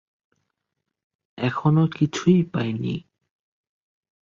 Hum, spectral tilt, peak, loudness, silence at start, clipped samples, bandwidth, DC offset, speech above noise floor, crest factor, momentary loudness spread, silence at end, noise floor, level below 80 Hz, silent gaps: none; -7 dB/octave; -6 dBFS; -22 LUFS; 1.35 s; under 0.1%; 7.4 kHz; under 0.1%; 60 dB; 20 dB; 9 LU; 1.25 s; -81 dBFS; -60 dBFS; none